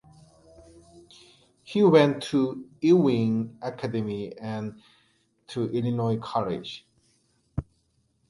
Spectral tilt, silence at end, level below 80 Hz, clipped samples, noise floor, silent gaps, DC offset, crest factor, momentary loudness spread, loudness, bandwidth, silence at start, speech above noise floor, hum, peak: -7.5 dB/octave; 0.65 s; -54 dBFS; under 0.1%; -70 dBFS; none; under 0.1%; 22 dB; 17 LU; -26 LUFS; 11.5 kHz; 0.95 s; 45 dB; none; -6 dBFS